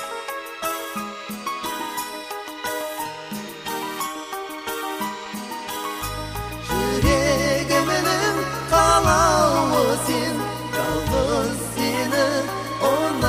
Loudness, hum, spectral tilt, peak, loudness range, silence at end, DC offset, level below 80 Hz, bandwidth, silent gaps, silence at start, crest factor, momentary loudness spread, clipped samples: -22 LUFS; none; -4 dB/octave; -4 dBFS; 10 LU; 0 s; under 0.1%; -38 dBFS; 15.5 kHz; none; 0 s; 18 dB; 13 LU; under 0.1%